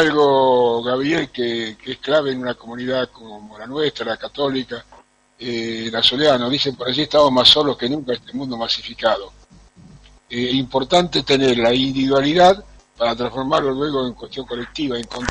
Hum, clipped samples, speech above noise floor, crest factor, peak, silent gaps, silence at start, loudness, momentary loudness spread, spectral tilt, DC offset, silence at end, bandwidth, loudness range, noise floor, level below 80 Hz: none; under 0.1%; 28 dB; 20 dB; 0 dBFS; none; 0 s; -18 LUFS; 14 LU; -4.5 dB/octave; under 0.1%; 0 s; 10.5 kHz; 7 LU; -47 dBFS; -48 dBFS